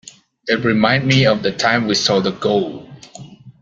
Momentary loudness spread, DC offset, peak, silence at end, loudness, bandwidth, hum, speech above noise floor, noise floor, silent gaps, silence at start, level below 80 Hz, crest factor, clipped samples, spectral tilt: 15 LU; under 0.1%; -2 dBFS; 0.1 s; -16 LUFS; 7.8 kHz; none; 23 dB; -38 dBFS; none; 0.45 s; -52 dBFS; 16 dB; under 0.1%; -5 dB/octave